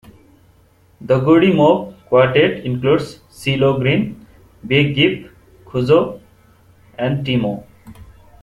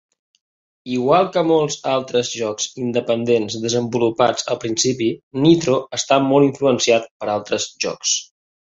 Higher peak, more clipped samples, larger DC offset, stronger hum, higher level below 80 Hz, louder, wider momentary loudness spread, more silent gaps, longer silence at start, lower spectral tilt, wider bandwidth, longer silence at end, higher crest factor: about the same, -2 dBFS vs -2 dBFS; neither; neither; neither; first, -48 dBFS vs -58 dBFS; about the same, -16 LUFS vs -18 LUFS; first, 14 LU vs 8 LU; second, none vs 5.23-5.31 s, 7.11-7.20 s; first, 1 s vs 0.85 s; first, -7.5 dB/octave vs -4 dB/octave; first, 12.5 kHz vs 8 kHz; about the same, 0.4 s vs 0.5 s; about the same, 16 dB vs 18 dB